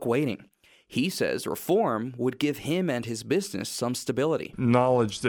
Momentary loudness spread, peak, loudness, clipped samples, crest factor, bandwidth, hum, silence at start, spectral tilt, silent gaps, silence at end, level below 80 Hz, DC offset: 8 LU; -8 dBFS; -27 LUFS; under 0.1%; 18 dB; over 20 kHz; none; 0 s; -5.5 dB/octave; none; 0 s; -62 dBFS; under 0.1%